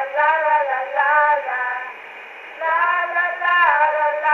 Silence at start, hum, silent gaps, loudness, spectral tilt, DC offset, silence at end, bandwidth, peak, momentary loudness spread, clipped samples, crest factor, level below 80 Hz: 0 s; none; none; -18 LUFS; -2 dB/octave; under 0.1%; 0 s; 6.4 kHz; -4 dBFS; 17 LU; under 0.1%; 16 dB; -70 dBFS